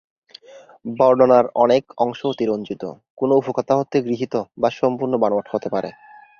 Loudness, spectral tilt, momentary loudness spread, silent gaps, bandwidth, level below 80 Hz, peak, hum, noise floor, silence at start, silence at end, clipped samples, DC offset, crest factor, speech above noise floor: -19 LUFS; -7 dB/octave; 14 LU; 3.10-3.17 s; 6.8 kHz; -64 dBFS; -2 dBFS; none; -44 dBFS; 0.55 s; 0.5 s; under 0.1%; under 0.1%; 18 dB; 26 dB